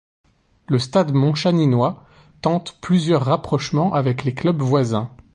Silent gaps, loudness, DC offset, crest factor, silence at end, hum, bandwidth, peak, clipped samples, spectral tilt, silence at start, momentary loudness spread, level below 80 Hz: none; -19 LUFS; under 0.1%; 16 dB; 0.2 s; none; 10 kHz; -4 dBFS; under 0.1%; -7 dB/octave; 0.7 s; 6 LU; -52 dBFS